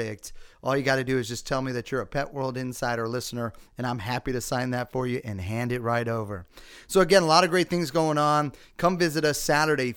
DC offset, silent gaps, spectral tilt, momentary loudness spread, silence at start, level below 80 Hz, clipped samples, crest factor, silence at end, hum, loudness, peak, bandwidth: under 0.1%; none; -4.5 dB/octave; 13 LU; 0 s; -50 dBFS; under 0.1%; 22 dB; 0 s; none; -26 LUFS; -4 dBFS; 19.5 kHz